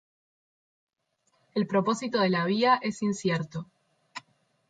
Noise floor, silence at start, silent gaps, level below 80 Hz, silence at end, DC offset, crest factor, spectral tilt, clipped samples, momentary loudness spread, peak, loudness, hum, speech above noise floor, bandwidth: -74 dBFS; 1.55 s; none; -72 dBFS; 0.5 s; under 0.1%; 20 dB; -5.5 dB/octave; under 0.1%; 21 LU; -10 dBFS; -27 LUFS; none; 47 dB; 9.2 kHz